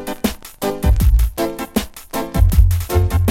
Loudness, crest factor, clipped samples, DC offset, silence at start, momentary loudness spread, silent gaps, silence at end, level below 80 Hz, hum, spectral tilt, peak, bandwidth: -18 LUFS; 16 dB; under 0.1%; under 0.1%; 0 s; 10 LU; none; 0 s; -18 dBFS; none; -6 dB/octave; 0 dBFS; 17 kHz